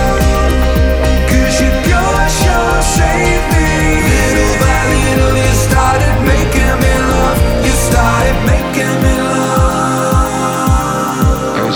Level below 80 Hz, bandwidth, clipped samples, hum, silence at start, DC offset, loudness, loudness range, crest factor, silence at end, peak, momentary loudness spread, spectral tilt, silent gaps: -16 dBFS; 20 kHz; under 0.1%; none; 0 s; under 0.1%; -12 LUFS; 1 LU; 10 dB; 0 s; 0 dBFS; 2 LU; -5 dB/octave; none